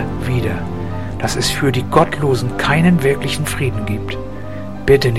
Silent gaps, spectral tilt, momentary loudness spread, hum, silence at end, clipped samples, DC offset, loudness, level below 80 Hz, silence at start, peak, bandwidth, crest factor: none; -5.5 dB/octave; 12 LU; none; 0 s; under 0.1%; 3%; -17 LUFS; -34 dBFS; 0 s; 0 dBFS; 15.5 kHz; 16 dB